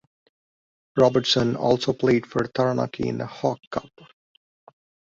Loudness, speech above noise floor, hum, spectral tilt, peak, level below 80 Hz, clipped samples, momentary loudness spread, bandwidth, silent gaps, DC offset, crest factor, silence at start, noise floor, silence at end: -23 LUFS; over 67 dB; none; -5.5 dB/octave; -4 dBFS; -56 dBFS; under 0.1%; 10 LU; 7.8 kHz; 3.67-3.71 s; under 0.1%; 20 dB; 0.95 s; under -90 dBFS; 1.3 s